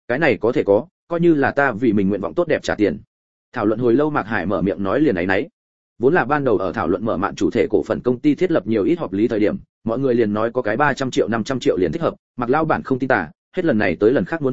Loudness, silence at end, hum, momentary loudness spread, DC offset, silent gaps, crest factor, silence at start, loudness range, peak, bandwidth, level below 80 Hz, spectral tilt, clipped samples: -19 LUFS; 0 s; none; 5 LU; 0.9%; 0.91-1.07 s, 3.07-3.52 s, 5.53-5.96 s, 9.69-9.81 s, 12.19-12.34 s, 13.35-13.52 s; 18 dB; 0.05 s; 1 LU; 0 dBFS; 7.8 kHz; -48 dBFS; -7 dB/octave; under 0.1%